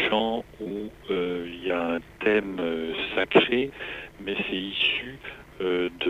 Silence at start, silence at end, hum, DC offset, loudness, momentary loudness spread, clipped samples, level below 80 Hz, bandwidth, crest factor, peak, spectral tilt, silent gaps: 0 s; 0 s; none; under 0.1%; -27 LUFS; 14 LU; under 0.1%; -54 dBFS; 15 kHz; 24 dB; -4 dBFS; -6 dB/octave; none